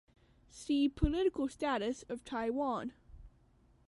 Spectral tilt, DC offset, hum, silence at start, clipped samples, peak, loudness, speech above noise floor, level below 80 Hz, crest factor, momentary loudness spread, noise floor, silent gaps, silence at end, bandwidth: -6 dB/octave; under 0.1%; none; 0.55 s; under 0.1%; -16 dBFS; -35 LUFS; 32 dB; -50 dBFS; 22 dB; 10 LU; -67 dBFS; none; 0.6 s; 11.5 kHz